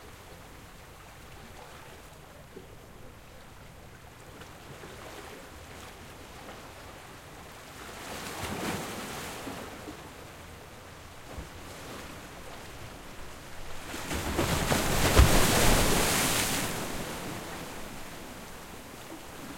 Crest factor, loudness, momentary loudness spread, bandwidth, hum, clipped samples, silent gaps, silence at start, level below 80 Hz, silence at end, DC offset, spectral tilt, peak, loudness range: 28 dB; -29 LUFS; 24 LU; 16.5 kHz; none; under 0.1%; none; 0 s; -40 dBFS; 0 s; under 0.1%; -3.5 dB/octave; -6 dBFS; 23 LU